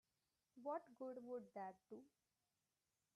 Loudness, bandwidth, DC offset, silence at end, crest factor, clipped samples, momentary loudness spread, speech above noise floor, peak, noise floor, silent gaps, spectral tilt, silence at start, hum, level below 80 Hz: -54 LUFS; 11.5 kHz; under 0.1%; 1.1 s; 18 dB; under 0.1%; 12 LU; over 37 dB; -38 dBFS; under -90 dBFS; none; -7 dB/octave; 0.55 s; none; under -90 dBFS